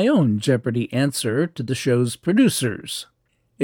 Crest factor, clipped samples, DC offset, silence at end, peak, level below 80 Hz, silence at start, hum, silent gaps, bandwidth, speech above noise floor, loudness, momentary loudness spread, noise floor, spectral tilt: 16 dB; under 0.1%; under 0.1%; 0 s; -6 dBFS; -62 dBFS; 0 s; none; none; 19 kHz; 25 dB; -21 LUFS; 8 LU; -45 dBFS; -5.5 dB/octave